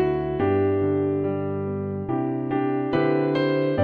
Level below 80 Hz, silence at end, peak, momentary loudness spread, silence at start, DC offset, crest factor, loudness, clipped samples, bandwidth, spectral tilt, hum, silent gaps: -50 dBFS; 0 s; -8 dBFS; 6 LU; 0 s; under 0.1%; 14 dB; -24 LUFS; under 0.1%; 5.2 kHz; -10 dB/octave; none; none